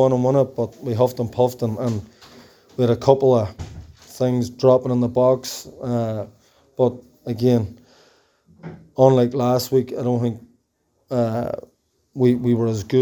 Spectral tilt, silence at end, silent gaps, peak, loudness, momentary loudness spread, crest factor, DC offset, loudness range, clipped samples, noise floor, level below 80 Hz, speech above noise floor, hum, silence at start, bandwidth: -7.5 dB/octave; 0 s; none; 0 dBFS; -20 LUFS; 19 LU; 20 dB; under 0.1%; 4 LU; under 0.1%; -68 dBFS; -54 dBFS; 49 dB; none; 0 s; over 20 kHz